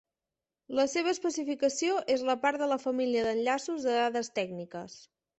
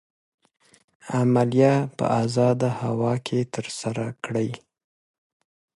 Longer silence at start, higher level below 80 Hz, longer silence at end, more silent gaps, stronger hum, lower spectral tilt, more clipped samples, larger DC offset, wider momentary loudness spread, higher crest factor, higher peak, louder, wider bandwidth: second, 0.7 s vs 1.05 s; second, -72 dBFS vs -62 dBFS; second, 0.35 s vs 1.2 s; neither; neither; second, -3 dB/octave vs -7 dB/octave; neither; neither; about the same, 8 LU vs 10 LU; about the same, 18 dB vs 18 dB; second, -14 dBFS vs -6 dBFS; second, -30 LUFS vs -23 LUFS; second, 8.4 kHz vs 11.5 kHz